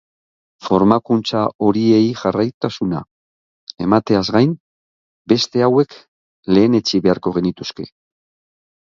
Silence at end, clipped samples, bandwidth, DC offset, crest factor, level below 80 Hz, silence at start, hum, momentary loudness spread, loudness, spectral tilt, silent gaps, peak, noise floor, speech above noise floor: 0.95 s; under 0.1%; 7.4 kHz; under 0.1%; 18 dB; -52 dBFS; 0.65 s; none; 14 LU; -17 LUFS; -6.5 dB/octave; 1.55-1.59 s, 2.54-2.61 s, 3.11-3.67 s, 4.60-5.25 s, 6.08-6.43 s; 0 dBFS; under -90 dBFS; over 74 dB